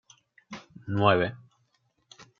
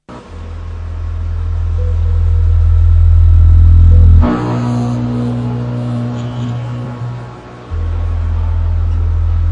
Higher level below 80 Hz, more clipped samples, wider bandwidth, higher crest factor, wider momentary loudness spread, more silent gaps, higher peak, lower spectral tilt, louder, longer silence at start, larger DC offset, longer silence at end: second, -66 dBFS vs -16 dBFS; neither; first, 7.2 kHz vs 4.5 kHz; first, 24 dB vs 10 dB; first, 23 LU vs 17 LU; neither; second, -6 dBFS vs 0 dBFS; second, -7 dB/octave vs -9.5 dB/octave; second, -25 LUFS vs -13 LUFS; first, 0.5 s vs 0.1 s; neither; first, 0.15 s vs 0 s